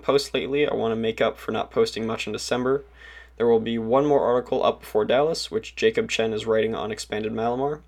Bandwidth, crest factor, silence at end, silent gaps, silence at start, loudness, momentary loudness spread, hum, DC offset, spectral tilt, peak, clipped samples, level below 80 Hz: 15 kHz; 16 dB; 0.1 s; none; 0.05 s; -24 LUFS; 7 LU; none; under 0.1%; -4.5 dB/octave; -8 dBFS; under 0.1%; -52 dBFS